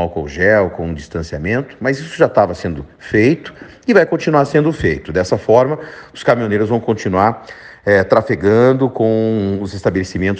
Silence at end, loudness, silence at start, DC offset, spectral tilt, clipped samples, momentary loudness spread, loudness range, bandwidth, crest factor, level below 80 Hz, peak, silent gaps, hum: 0 s; -15 LUFS; 0 s; under 0.1%; -7 dB/octave; under 0.1%; 12 LU; 2 LU; 9.2 kHz; 16 dB; -40 dBFS; 0 dBFS; none; none